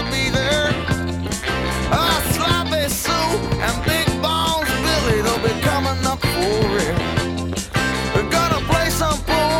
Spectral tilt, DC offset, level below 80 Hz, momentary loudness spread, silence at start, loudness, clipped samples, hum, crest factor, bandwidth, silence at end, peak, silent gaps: -4 dB/octave; under 0.1%; -30 dBFS; 4 LU; 0 s; -19 LUFS; under 0.1%; none; 16 dB; 17.5 kHz; 0 s; -4 dBFS; none